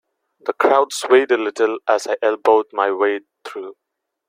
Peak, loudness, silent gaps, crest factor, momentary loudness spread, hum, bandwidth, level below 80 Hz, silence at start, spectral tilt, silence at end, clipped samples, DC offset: -2 dBFS; -18 LUFS; none; 18 dB; 17 LU; none; 15.5 kHz; -68 dBFS; 0.45 s; -2.5 dB/octave; 0.6 s; under 0.1%; under 0.1%